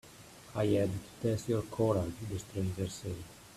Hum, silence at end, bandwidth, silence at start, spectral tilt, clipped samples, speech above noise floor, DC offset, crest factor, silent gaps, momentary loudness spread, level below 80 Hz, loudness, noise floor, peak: none; 0 s; 14.5 kHz; 0.05 s; -6.5 dB/octave; under 0.1%; 20 dB; under 0.1%; 18 dB; none; 12 LU; -58 dBFS; -35 LUFS; -54 dBFS; -18 dBFS